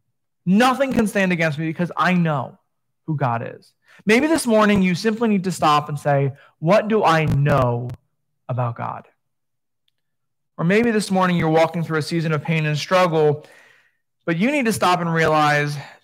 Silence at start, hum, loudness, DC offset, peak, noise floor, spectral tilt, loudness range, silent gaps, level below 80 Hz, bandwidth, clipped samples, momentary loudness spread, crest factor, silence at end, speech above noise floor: 0.45 s; none; -19 LUFS; under 0.1%; -2 dBFS; -84 dBFS; -6 dB/octave; 5 LU; none; -50 dBFS; 16 kHz; under 0.1%; 11 LU; 18 dB; 0.15 s; 65 dB